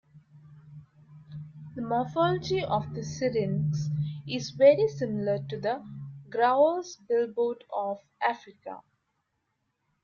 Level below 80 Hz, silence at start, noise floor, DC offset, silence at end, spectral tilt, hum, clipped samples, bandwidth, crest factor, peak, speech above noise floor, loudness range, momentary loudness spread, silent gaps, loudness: -66 dBFS; 0.15 s; -78 dBFS; under 0.1%; 1.25 s; -6.5 dB/octave; none; under 0.1%; 7.2 kHz; 20 dB; -8 dBFS; 51 dB; 5 LU; 21 LU; none; -28 LUFS